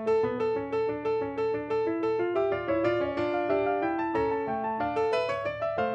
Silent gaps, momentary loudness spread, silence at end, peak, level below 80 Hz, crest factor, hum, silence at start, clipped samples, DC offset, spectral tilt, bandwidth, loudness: none; 3 LU; 0 s; -14 dBFS; -58 dBFS; 14 dB; none; 0 s; under 0.1%; under 0.1%; -7 dB/octave; 8.4 kHz; -29 LUFS